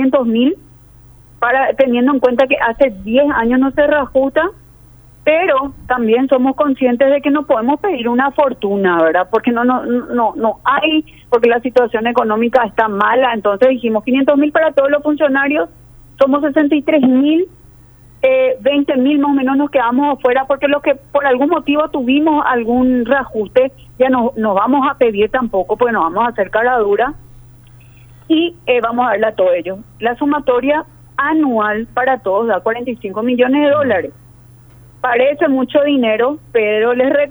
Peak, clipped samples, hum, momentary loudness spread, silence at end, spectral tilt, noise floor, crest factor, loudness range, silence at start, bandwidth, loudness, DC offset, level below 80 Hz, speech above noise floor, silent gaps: 0 dBFS; under 0.1%; none; 5 LU; 0 s; -7 dB/octave; -42 dBFS; 14 dB; 3 LU; 0 s; over 20 kHz; -14 LUFS; under 0.1%; -46 dBFS; 29 dB; none